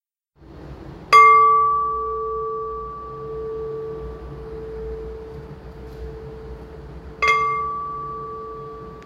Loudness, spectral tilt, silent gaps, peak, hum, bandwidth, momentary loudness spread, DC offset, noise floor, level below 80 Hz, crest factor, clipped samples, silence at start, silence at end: -18 LUFS; -4 dB/octave; none; -2 dBFS; none; 13 kHz; 25 LU; under 0.1%; -51 dBFS; -42 dBFS; 20 dB; under 0.1%; 0.4 s; 0 s